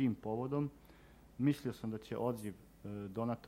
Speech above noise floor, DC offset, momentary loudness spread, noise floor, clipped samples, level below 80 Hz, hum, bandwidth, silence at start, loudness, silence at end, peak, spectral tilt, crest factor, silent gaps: 22 dB; under 0.1%; 13 LU; -61 dBFS; under 0.1%; -66 dBFS; none; 16 kHz; 0 s; -40 LUFS; 0 s; -20 dBFS; -8 dB/octave; 18 dB; none